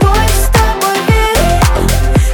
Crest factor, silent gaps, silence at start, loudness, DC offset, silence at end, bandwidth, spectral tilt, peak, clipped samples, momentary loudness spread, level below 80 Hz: 10 dB; none; 0 s; -11 LUFS; under 0.1%; 0 s; 19.5 kHz; -4.5 dB/octave; 0 dBFS; under 0.1%; 2 LU; -12 dBFS